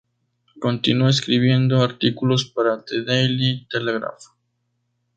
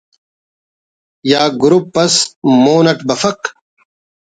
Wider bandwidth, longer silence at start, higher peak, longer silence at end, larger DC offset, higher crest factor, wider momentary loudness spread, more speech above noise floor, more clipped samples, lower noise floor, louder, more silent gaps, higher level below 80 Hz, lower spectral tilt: about the same, 8.8 kHz vs 9.4 kHz; second, 0.55 s vs 1.25 s; about the same, -2 dBFS vs 0 dBFS; about the same, 0.95 s vs 0.85 s; neither; about the same, 18 dB vs 14 dB; about the same, 8 LU vs 10 LU; second, 52 dB vs over 78 dB; neither; second, -72 dBFS vs under -90 dBFS; second, -20 LUFS vs -12 LUFS; second, none vs 2.36-2.42 s; about the same, -58 dBFS vs -58 dBFS; first, -6 dB/octave vs -4 dB/octave